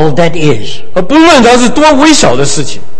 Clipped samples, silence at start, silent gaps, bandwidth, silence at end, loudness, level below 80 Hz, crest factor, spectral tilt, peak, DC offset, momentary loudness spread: 7%; 0 s; none; 11 kHz; 0 s; -6 LUFS; -30 dBFS; 8 dB; -4 dB/octave; 0 dBFS; 30%; 12 LU